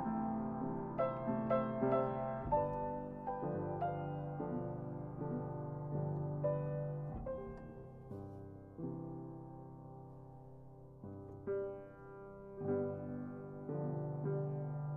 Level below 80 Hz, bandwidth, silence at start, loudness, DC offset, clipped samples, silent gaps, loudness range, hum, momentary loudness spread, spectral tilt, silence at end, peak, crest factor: -62 dBFS; 3.6 kHz; 0 s; -41 LUFS; under 0.1%; under 0.1%; none; 11 LU; none; 17 LU; -11.5 dB/octave; 0 s; -22 dBFS; 20 dB